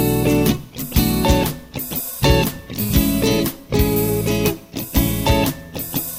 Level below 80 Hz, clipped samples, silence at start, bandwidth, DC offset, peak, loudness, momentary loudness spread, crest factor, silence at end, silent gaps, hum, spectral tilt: -28 dBFS; under 0.1%; 0 s; 17.5 kHz; 0.2%; -2 dBFS; -19 LUFS; 8 LU; 16 dB; 0 s; none; none; -5 dB/octave